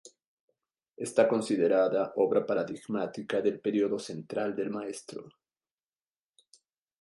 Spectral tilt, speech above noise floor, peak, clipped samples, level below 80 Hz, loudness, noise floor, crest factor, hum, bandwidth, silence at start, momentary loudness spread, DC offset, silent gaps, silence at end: -5.5 dB/octave; over 61 dB; -10 dBFS; under 0.1%; -78 dBFS; -30 LUFS; under -90 dBFS; 22 dB; none; 11.5 kHz; 0.05 s; 13 LU; under 0.1%; 0.27-0.48 s, 0.89-0.94 s; 1.7 s